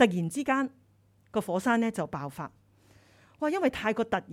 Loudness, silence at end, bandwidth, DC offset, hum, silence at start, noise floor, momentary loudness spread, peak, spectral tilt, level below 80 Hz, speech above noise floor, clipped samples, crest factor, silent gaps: -30 LUFS; 0 s; 15.5 kHz; under 0.1%; none; 0 s; -64 dBFS; 10 LU; -10 dBFS; -5.5 dB/octave; -62 dBFS; 35 dB; under 0.1%; 20 dB; none